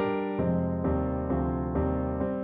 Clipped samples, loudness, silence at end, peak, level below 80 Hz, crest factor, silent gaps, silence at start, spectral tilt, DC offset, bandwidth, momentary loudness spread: under 0.1%; -29 LUFS; 0 s; -16 dBFS; -38 dBFS; 12 dB; none; 0 s; -12 dB/octave; under 0.1%; 4 kHz; 1 LU